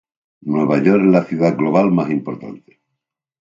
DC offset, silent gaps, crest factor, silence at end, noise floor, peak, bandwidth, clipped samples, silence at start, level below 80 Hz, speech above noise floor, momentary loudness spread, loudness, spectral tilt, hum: under 0.1%; none; 16 dB; 0.95 s; -79 dBFS; 0 dBFS; 7.6 kHz; under 0.1%; 0.45 s; -60 dBFS; 63 dB; 17 LU; -16 LUFS; -9 dB/octave; none